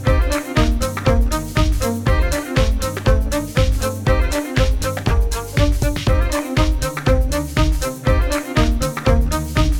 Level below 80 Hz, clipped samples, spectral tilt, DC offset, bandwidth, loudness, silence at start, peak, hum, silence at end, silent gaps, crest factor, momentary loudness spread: -20 dBFS; under 0.1%; -5.5 dB/octave; under 0.1%; 17.5 kHz; -19 LUFS; 0 s; -2 dBFS; none; 0 s; none; 14 dB; 2 LU